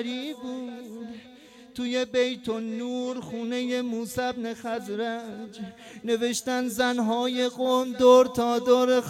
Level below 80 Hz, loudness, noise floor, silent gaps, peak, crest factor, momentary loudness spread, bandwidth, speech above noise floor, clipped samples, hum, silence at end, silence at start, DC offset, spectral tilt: -66 dBFS; -26 LUFS; -50 dBFS; none; -6 dBFS; 20 dB; 18 LU; 14.5 kHz; 24 dB; under 0.1%; none; 0 s; 0 s; under 0.1%; -4 dB/octave